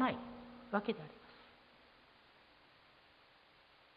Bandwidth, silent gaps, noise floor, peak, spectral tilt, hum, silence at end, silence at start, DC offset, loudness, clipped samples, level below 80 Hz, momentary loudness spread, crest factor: 5 kHz; none; -66 dBFS; -20 dBFS; -4 dB/octave; none; 2.45 s; 0 s; under 0.1%; -42 LUFS; under 0.1%; -74 dBFS; 26 LU; 26 dB